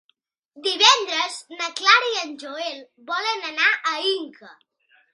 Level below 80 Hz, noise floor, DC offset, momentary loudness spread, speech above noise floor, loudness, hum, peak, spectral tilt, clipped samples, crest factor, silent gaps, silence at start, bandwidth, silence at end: -84 dBFS; -68 dBFS; under 0.1%; 16 LU; 46 dB; -20 LUFS; none; 0 dBFS; 2 dB/octave; under 0.1%; 24 dB; none; 0.55 s; 11.5 kHz; 0.6 s